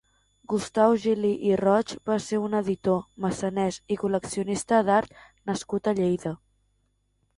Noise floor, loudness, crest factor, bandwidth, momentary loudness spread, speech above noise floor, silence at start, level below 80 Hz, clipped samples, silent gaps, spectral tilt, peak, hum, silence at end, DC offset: -71 dBFS; -26 LUFS; 18 dB; 11.5 kHz; 9 LU; 46 dB; 0.5 s; -60 dBFS; under 0.1%; none; -6 dB/octave; -8 dBFS; 50 Hz at -60 dBFS; 1 s; under 0.1%